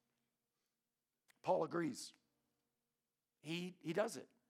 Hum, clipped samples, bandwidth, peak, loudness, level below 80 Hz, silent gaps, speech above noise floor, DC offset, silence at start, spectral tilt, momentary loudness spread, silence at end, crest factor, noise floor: none; under 0.1%; 16 kHz; -24 dBFS; -43 LUFS; under -90 dBFS; none; over 48 dB; under 0.1%; 1.45 s; -5 dB/octave; 13 LU; 0.25 s; 22 dB; under -90 dBFS